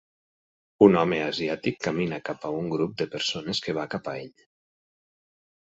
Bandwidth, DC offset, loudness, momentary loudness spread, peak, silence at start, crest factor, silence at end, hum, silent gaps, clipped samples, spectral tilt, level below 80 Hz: 8 kHz; under 0.1%; -26 LUFS; 14 LU; -4 dBFS; 0.8 s; 24 dB; 1.3 s; none; none; under 0.1%; -5.5 dB/octave; -62 dBFS